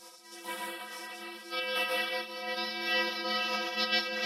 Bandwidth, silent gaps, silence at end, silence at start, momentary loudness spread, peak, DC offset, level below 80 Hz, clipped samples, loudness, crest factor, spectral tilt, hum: 16 kHz; none; 0 s; 0 s; 13 LU; -16 dBFS; under 0.1%; -88 dBFS; under 0.1%; -32 LUFS; 18 dB; -1 dB/octave; none